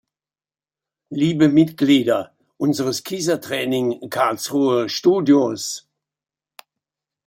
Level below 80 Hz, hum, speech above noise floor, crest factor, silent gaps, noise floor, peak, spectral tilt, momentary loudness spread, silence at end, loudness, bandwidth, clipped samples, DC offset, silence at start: -64 dBFS; none; over 72 dB; 18 dB; none; under -90 dBFS; -4 dBFS; -5 dB/octave; 9 LU; 1.45 s; -19 LUFS; 16.5 kHz; under 0.1%; under 0.1%; 1.1 s